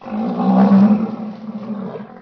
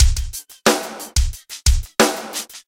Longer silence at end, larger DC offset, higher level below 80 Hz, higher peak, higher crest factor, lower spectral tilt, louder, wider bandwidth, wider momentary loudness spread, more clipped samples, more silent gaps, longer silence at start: about the same, 0 s vs 0.1 s; neither; second, -64 dBFS vs -22 dBFS; about the same, -2 dBFS vs 0 dBFS; about the same, 14 dB vs 18 dB; first, -10.5 dB/octave vs -3.5 dB/octave; first, -14 LUFS vs -20 LUFS; second, 5.4 kHz vs 17 kHz; first, 18 LU vs 9 LU; neither; neither; about the same, 0 s vs 0 s